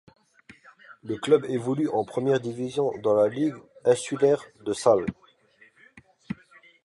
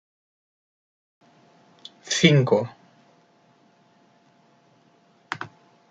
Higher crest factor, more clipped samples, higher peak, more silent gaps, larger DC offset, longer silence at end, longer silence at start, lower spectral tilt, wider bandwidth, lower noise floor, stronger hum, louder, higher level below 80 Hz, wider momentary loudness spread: second, 20 dB vs 26 dB; neither; second, -6 dBFS vs -2 dBFS; neither; neither; about the same, 0.55 s vs 0.45 s; second, 0.9 s vs 2.05 s; about the same, -6 dB/octave vs -5 dB/octave; first, 11.5 kHz vs 9.2 kHz; about the same, -59 dBFS vs -60 dBFS; neither; second, -25 LUFS vs -22 LUFS; about the same, -64 dBFS vs -68 dBFS; second, 14 LU vs 27 LU